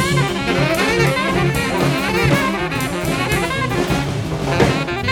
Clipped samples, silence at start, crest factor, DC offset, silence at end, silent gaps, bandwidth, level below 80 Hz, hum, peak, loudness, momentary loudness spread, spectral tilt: under 0.1%; 0 s; 16 dB; under 0.1%; 0 s; none; 18.5 kHz; -34 dBFS; none; -2 dBFS; -17 LUFS; 5 LU; -5 dB/octave